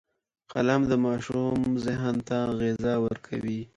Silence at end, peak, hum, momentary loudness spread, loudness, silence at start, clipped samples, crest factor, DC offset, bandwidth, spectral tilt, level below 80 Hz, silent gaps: 0.1 s; -10 dBFS; none; 8 LU; -27 LUFS; 0.5 s; under 0.1%; 18 dB; under 0.1%; 9.2 kHz; -7 dB/octave; -54 dBFS; none